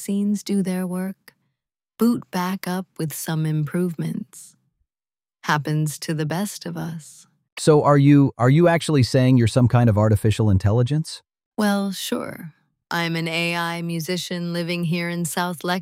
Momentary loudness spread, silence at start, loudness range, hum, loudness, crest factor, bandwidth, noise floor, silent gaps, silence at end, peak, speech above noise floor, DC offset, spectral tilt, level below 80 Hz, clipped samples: 14 LU; 0 s; 10 LU; none; -21 LUFS; 18 dB; 16 kHz; under -90 dBFS; 7.52-7.56 s, 11.46-11.51 s; 0 s; -4 dBFS; over 70 dB; under 0.1%; -6 dB/octave; -52 dBFS; under 0.1%